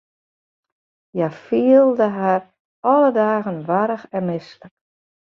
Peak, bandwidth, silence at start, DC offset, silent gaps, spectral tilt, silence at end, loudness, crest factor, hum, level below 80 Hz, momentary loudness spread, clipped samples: -2 dBFS; 6.2 kHz; 1.15 s; under 0.1%; 2.60-2.83 s; -9 dB/octave; 0.55 s; -18 LUFS; 16 dB; none; -68 dBFS; 11 LU; under 0.1%